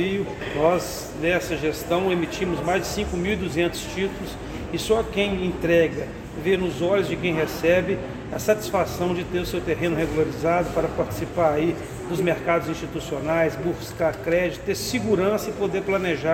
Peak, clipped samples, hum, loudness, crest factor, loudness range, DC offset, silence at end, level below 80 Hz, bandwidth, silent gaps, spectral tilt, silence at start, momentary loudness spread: -4 dBFS; under 0.1%; none; -24 LUFS; 18 dB; 2 LU; under 0.1%; 0 s; -42 dBFS; 17 kHz; none; -5.5 dB/octave; 0 s; 7 LU